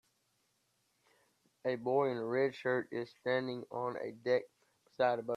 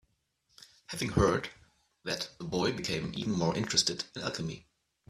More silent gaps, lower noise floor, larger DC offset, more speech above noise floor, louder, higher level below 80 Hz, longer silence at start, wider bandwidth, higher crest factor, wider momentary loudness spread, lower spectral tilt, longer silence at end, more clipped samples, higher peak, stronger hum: neither; about the same, -78 dBFS vs -75 dBFS; neither; about the same, 43 dB vs 43 dB; second, -36 LUFS vs -32 LUFS; second, -84 dBFS vs -52 dBFS; first, 1.65 s vs 0.6 s; second, 10.5 kHz vs 14.5 kHz; about the same, 18 dB vs 22 dB; second, 7 LU vs 14 LU; first, -7 dB/octave vs -4 dB/octave; second, 0 s vs 0.5 s; neither; second, -18 dBFS vs -12 dBFS; neither